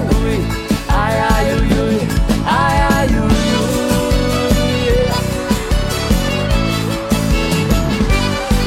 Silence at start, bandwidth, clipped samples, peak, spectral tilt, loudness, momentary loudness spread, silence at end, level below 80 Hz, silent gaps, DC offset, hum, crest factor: 0 s; 16.5 kHz; under 0.1%; -4 dBFS; -5.5 dB/octave; -15 LUFS; 4 LU; 0 s; -20 dBFS; none; under 0.1%; none; 10 dB